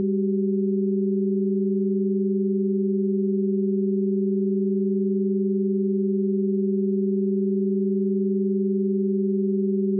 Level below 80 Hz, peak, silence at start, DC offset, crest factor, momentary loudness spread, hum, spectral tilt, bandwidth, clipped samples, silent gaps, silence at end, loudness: under -90 dBFS; -16 dBFS; 0 s; under 0.1%; 6 dB; 0 LU; none; -18 dB/octave; 0.5 kHz; under 0.1%; none; 0 s; -23 LUFS